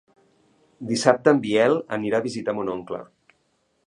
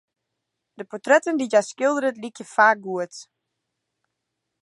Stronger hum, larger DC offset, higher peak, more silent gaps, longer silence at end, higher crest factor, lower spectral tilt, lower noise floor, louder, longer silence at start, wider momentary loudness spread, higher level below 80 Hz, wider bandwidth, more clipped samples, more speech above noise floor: neither; neither; first, 0 dBFS vs -4 dBFS; neither; second, 0.85 s vs 1.4 s; about the same, 24 dB vs 20 dB; first, -5 dB/octave vs -3.5 dB/octave; second, -69 dBFS vs -81 dBFS; about the same, -22 LUFS vs -21 LUFS; about the same, 0.8 s vs 0.8 s; second, 15 LU vs 18 LU; first, -66 dBFS vs -82 dBFS; about the same, 11 kHz vs 11.5 kHz; neither; second, 47 dB vs 59 dB